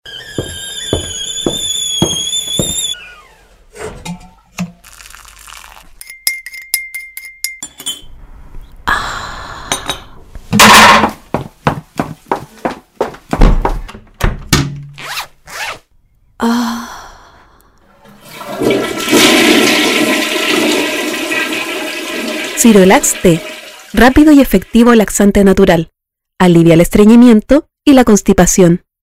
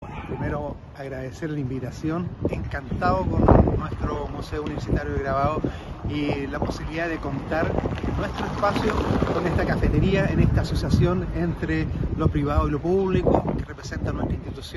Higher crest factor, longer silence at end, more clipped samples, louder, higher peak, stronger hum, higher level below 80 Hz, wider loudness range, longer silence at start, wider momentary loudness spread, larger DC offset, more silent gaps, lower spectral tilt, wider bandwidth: second, 12 dB vs 22 dB; first, 0.25 s vs 0 s; first, 1% vs under 0.1%; first, -10 LUFS vs -25 LUFS; about the same, 0 dBFS vs -2 dBFS; neither; first, -26 dBFS vs -32 dBFS; first, 14 LU vs 4 LU; about the same, 0.05 s vs 0 s; first, 19 LU vs 10 LU; neither; neither; second, -4 dB/octave vs -8 dB/octave; first, over 20 kHz vs 12 kHz